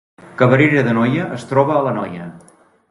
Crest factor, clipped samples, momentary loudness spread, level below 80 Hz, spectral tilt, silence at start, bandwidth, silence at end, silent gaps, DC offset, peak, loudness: 16 dB; under 0.1%; 18 LU; -54 dBFS; -8 dB/octave; 0.25 s; 11.5 kHz; 0.55 s; none; under 0.1%; 0 dBFS; -16 LUFS